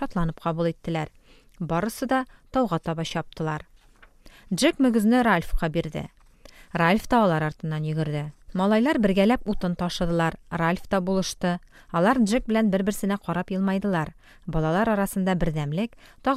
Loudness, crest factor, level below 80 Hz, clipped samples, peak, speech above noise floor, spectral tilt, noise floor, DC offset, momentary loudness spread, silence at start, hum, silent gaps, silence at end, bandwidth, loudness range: -25 LUFS; 18 dB; -40 dBFS; under 0.1%; -6 dBFS; 30 dB; -6 dB/octave; -54 dBFS; under 0.1%; 10 LU; 0 s; none; none; 0 s; 15 kHz; 5 LU